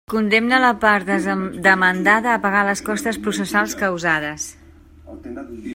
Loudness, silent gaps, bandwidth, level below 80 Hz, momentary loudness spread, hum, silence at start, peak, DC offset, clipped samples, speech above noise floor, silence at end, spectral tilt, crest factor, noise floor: -17 LUFS; none; 16.5 kHz; -50 dBFS; 16 LU; none; 0.1 s; 0 dBFS; under 0.1%; under 0.1%; 26 dB; 0 s; -4 dB/octave; 20 dB; -45 dBFS